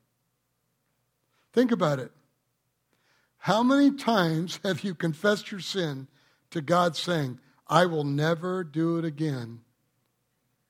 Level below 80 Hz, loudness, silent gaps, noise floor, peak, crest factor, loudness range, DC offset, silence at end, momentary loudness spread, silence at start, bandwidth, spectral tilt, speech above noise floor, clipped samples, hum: -72 dBFS; -27 LUFS; none; -76 dBFS; -6 dBFS; 22 dB; 3 LU; under 0.1%; 1.1 s; 13 LU; 1.55 s; 16 kHz; -6 dB/octave; 50 dB; under 0.1%; none